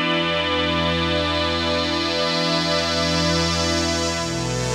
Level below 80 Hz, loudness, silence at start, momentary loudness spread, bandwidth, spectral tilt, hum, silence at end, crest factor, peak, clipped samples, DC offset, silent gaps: -38 dBFS; -20 LUFS; 0 s; 2 LU; 15 kHz; -3.5 dB/octave; none; 0 s; 14 dB; -6 dBFS; under 0.1%; under 0.1%; none